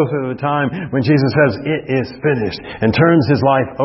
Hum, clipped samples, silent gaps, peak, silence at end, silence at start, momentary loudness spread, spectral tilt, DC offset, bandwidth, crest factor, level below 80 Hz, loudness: none; under 0.1%; none; 0 dBFS; 0 s; 0 s; 8 LU; -11 dB/octave; under 0.1%; 5.8 kHz; 14 dB; -46 dBFS; -16 LUFS